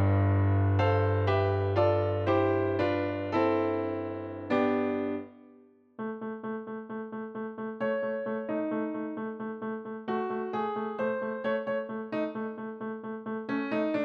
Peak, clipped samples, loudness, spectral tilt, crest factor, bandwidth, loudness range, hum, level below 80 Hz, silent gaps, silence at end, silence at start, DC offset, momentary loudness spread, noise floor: -14 dBFS; under 0.1%; -31 LUFS; -9.5 dB/octave; 16 dB; 5.4 kHz; 8 LU; none; -72 dBFS; none; 0 s; 0 s; under 0.1%; 12 LU; -58 dBFS